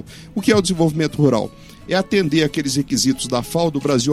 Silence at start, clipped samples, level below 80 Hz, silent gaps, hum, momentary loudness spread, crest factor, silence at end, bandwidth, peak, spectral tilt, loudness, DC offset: 0 s; under 0.1%; -46 dBFS; none; none; 6 LU; 16 dB; 0 s; 15.5 kHz; -4 dBFS; -5 dB/octave; -18 LUFS; under 0.1%